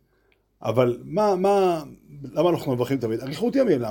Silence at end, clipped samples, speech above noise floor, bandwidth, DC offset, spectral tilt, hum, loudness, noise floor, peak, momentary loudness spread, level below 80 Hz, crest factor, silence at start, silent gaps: 0 s; under 0.1%; 43 dB; 17 kHz; under 0.1%; -7 dB/octave; none; -23 LUFS; -65 dBFS; -6 dBFS; 11 LU; -58 dBFS; 18 dB; 0.6 s; none